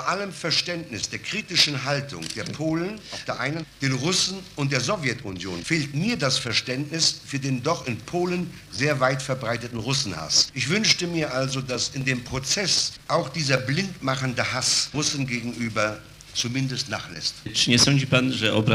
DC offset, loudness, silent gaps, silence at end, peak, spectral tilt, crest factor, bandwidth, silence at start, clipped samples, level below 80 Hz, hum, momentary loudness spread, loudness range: under 0.1%; -24 LUFS; none; 0 s; -2 dBFS; -3.5 dB/octave; 22 dB; 15.5 kHz; 0 s; under 0.1%; -54 dBFS; none; 9 LU; 3 LU